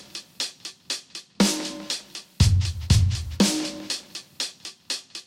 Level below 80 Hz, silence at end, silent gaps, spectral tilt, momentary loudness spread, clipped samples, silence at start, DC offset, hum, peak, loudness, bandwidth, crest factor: -36 dBFS; 0.05 s; none; -4.5 dB/octave; 18 LU; under 0.1%; 0 s; under 0.1%; none; -6 dBFS; -25 LUFS; 16 kHz; 20 dB